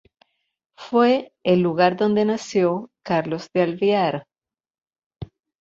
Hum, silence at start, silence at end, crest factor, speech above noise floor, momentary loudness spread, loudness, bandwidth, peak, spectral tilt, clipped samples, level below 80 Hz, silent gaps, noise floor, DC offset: none; 0.8 s; 0.35 s; 18 dB; 44 dB; 16 LU; -21 LUFS; 7.8 kHz; -4 dBFS; -6.5 dB/octave; under 0.1%; -60 dBFS; 4.70-4.74 s, 5.06-5.10 s; -64 dBFS; under 0.1%